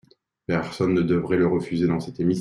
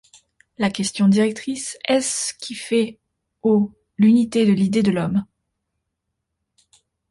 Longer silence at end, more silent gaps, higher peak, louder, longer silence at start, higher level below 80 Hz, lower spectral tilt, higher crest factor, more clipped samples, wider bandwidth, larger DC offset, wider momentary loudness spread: second, 0 s vs 1.85 s; neither; about the same, -8 dBFS vs -6 dBFS; second, -23 LUFS vs -20 LUFS; about the same, 0.5 s vs 0.6 s; about the same, -54 dBFS vs -58 dBFS; first, -8 dB/octave vs -5 dB/octave; about the same, 14 dB vs 14 dB; neither; about the same, 11.5 kHz vs 11.5 kHz; neither; second, 6 LU vs 11 LU